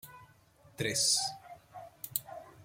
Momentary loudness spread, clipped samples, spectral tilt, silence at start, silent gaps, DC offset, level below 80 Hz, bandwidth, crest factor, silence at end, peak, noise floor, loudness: 24 LU; under 0.1%; -1 dB/octave; 0.05 s; none; under 0.1%; -72 dBFS; 16.5 kHz; 26 dB; 0 s; -12 dBFS; -62 dBFS; -31 LUFS